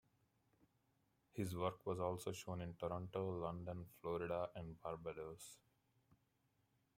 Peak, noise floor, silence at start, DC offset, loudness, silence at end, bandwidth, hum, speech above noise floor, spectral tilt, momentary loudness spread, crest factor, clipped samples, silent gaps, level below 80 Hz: -26 dBFS; -82 dBFS; 1.35 s; under 0.1%; -47 LUFS; 1.4 s; 16 kHz; none; 36 dB; -6 dB/octave; 9 LU; 22 dB; under 0.1%; none; -74 dBFS